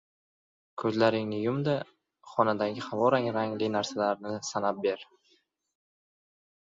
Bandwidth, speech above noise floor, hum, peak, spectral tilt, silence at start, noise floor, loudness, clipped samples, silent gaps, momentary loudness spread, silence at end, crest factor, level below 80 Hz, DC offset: 7.8 kHz; 41 dB; none; -10 dBFS; -5.5 dB/octave; 0.75 s; -69 dBFS; -29 LUFS; under 0.1%; none; 8 LU; 1.65 s; 22 dB; -72 dBFS; under 0.1%